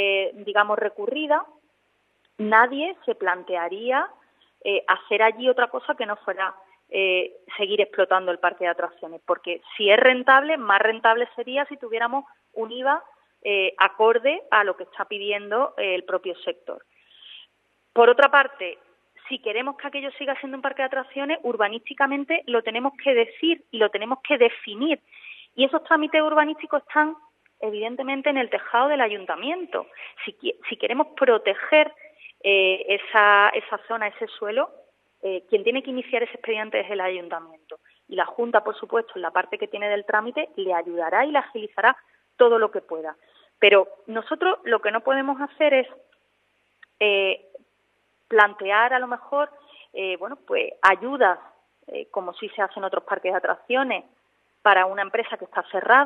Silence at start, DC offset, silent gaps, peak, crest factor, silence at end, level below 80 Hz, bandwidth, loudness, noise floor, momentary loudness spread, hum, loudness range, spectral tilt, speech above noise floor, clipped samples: 0 s; under 0.1%; none; 0 dBFS; 22 dB; 0 s; -84 dBFS; 5.8 kHz; -22 LUFS; -68 dBFS; 13 LU; 50 Hz at -75 dBFS; 6 LU; -5 dB/octave; 46 dB; under 0.1%